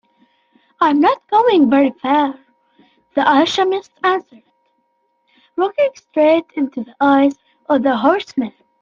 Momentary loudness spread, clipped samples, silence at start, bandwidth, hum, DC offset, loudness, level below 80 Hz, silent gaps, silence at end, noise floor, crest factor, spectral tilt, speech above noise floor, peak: 10 LU; under 0.1%; 0.8 s; 7.2 kHz; none; under 0.1%; -16 LUFS; -62 dBFS; none; 0.3 s; -65 dBFS; 14 dB; -5 dB/octave; 50 dB; -2 dBFS